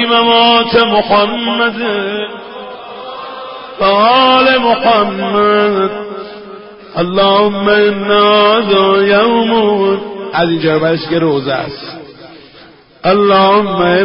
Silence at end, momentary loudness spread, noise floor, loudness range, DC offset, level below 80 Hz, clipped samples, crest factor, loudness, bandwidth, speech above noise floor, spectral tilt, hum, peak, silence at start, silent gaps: 0 s; 19 LU; -40 dBFS; 5 LU; under 0.1%; -48 dBFS; under 0.1%; 12 dB; -10 LUFS; 5.6 kHz; 29 dB; -8.5 dB/octave; none; 0 dBFS; 0 s; none